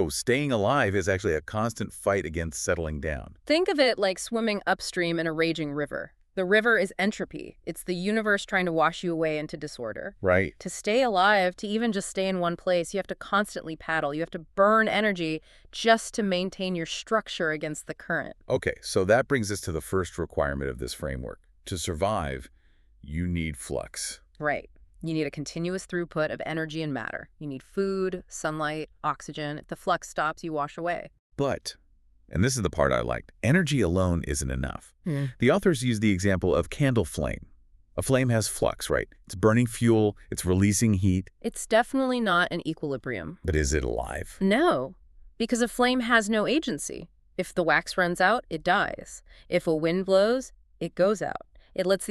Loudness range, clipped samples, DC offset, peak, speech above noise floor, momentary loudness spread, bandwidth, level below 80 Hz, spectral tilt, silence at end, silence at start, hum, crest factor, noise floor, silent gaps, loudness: 6 LU; under 0.1%; under 0.1%; -6 dBFS; 32 dB; 12 LU; 13.5 kHz; -46 dBFS; -5 dB/octave; 0 s; 0 s; none; 20 dB; -58 dBFS; 31.19-31.30 s; -27 LUFS